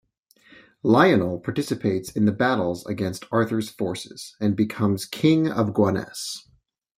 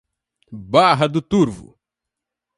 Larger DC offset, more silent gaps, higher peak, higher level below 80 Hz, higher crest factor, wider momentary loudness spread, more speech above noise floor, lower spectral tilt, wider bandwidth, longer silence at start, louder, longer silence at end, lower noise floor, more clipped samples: neither; neither; second, -4 dBFS vs 0 dBFS; second, -60 dBFS vs -52 dBFS; about the same, 20 dB vs 20 dB; second, 11 LU vs 21 LU; second, 35 dB vs 67 dB; about the same, -6 dB/octave vs -6 dB/octave; first, 16 kHz vs 11.5 kHz; first, 0.85 s vs 0.5 s; second, -23 LUFS vs -17 LUFS; second, 0.6 s vs 0.95 s; second, -57 dBFS vs -84 dBFS; neither